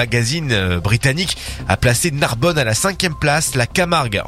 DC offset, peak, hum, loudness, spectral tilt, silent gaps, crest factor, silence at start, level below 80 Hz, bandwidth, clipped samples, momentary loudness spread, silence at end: under 0.1%; 0 dBFS; none; -17 LUFS; -4 dB/octave; none; 16 dB; 0 s; -34 dBFS; 16 kHz; under 0.1%; 3 LU; 0 s